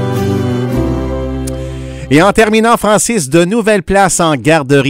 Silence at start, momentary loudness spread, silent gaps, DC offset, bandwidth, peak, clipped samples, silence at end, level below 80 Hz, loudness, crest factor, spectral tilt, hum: 0 s; 11 LU; none; under 0.1%; 16.5 kHz; 0 dBFS; 0.4%; 0 s; -28 dBFS; -11 LUFS; 10 dB; -5 dB/octave; none